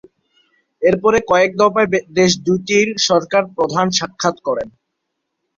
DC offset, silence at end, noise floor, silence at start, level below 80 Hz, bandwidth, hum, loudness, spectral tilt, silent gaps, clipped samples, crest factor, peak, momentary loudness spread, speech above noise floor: under 0.1%; 0.9 s; -75 dBFS; 0.8 s; -52 dBFS; 7.6 kHz; none; -16 LUFS; -4 dB/octave; none; under 0.1%; 16 dB; -2 dBFS; 6 LU; 59 dB